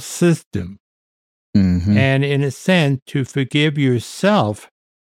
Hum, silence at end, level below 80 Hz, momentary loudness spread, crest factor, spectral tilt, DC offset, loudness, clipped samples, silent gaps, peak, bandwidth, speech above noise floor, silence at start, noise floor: none; 0.35 s; -46 dBFS; 8 LU; 14 dB; -6 dB/octave; under 0.1%; -17 LUFS; under 0.1%; 0.46-0.51 s, 0.80-1.53 s, 3.02-3.06 s; -2 dBFS; 15 kHz; over 73 dB; 0 s; under -90 dBFS